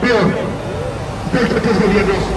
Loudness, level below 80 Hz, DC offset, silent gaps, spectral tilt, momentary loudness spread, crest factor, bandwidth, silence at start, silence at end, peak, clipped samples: -16 LUFS; -32 dBFS; under 0.1%; none; -6.5 dB/octave; 9 LU; 14 dB; 12 kHz; 0 s; 0 s; -2 dBFS; under 0.1%